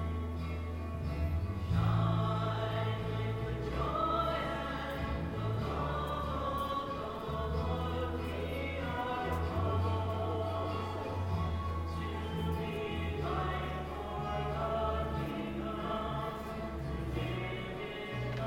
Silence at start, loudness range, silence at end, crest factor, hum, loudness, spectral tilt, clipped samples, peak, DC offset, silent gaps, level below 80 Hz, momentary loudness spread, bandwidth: 0 s; 3 LU; 0 s; 16 dB; none; -36 LUFS; -7.5 dB/octave; under 0.1%; -20 dBFS; under 0.1%; none; -44 dBFS; 6 LU; 16.5 kHz